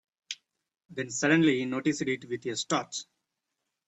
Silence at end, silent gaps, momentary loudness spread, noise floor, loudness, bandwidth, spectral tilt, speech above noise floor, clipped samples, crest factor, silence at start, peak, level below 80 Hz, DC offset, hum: 0.85 s; none; 18 LU; -84 dBFS; -29 LUFS; 8.4 kHz; -4 dB/octave; 56 dB; under 0.1%; 20 dB; 0.3 s; -10 dBFS; -72 dBFS; under 0.1%; none